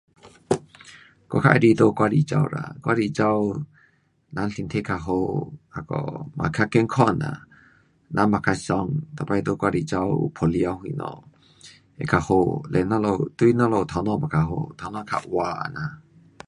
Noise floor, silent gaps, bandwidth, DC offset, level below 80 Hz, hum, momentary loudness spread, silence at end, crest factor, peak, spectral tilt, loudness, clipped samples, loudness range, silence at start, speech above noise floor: -62 dBFS; none; 11 kHz; under 0.1%; -48 dBFS; none; 13 LU; 0.5 s; 22 dB; 0 dBFS; -7.5 dB/octave; -23 LUFS; under 0.1%; 5 LU; 0.25 s; 39 dB